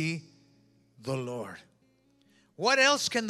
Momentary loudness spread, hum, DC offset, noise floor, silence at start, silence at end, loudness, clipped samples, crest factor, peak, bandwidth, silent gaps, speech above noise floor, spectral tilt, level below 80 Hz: 21 LU; none; under 0.1%; -67 dBFS; 0 s; 0 s; -27 LUFS; under 0.1%; 22 dB; -8 dBFS; 15 kHz; none; 38 dB; -3 dB/octave; -80 dBFS